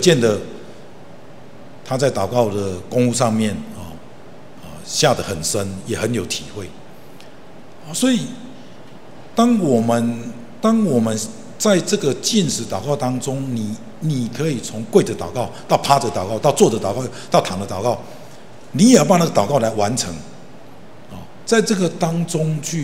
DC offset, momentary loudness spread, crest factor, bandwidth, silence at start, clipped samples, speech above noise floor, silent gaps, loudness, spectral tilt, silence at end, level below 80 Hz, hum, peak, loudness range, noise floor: 2%; 18 LU; 20 dB; 16 kHz; 0 s; under 0.1%; 24 dB; none; -19 LUFS; -5 dB/octave; 0 s; -54 dBFS; none; 0 dBFS; 5 LU; -42 dBFS